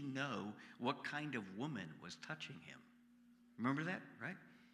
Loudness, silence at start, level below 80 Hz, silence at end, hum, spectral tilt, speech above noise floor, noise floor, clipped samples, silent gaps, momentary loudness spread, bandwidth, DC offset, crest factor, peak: -45 LUFS; 0 s; -90 dBFS; 0 s; none; -5.5 dB/octave; 23 dB; -68 dBFS; under 0.1%; none; 15 LU; 12 kHz; under 0.1%; 22 dB; -24 dBFS